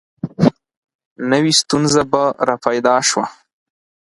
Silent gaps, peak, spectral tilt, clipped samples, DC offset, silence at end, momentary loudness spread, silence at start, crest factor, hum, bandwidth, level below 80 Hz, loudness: 0.77-0.83 s, 0.95-0.99 s, 1.05-1.16 s; 0 dBFS; -4 dB/octave; under 0.1%; under 0.1%; 0.8 s; 9 LU; 0.25 s; 18 dB; none; 11.5 kHz; -54 dBFS; -16 LUFS